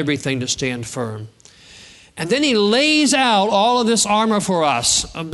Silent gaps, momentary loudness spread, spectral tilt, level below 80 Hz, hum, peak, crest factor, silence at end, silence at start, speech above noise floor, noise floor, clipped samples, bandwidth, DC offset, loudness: none; 12 LU; -3 dB/octave; -50 dBFS; none; -4 dBFS; 16 dB; 0 s; 0 s; 27 dB; -44 dBFS; under 0.1%; 12 kHz; under 0.1%; -16 LUFS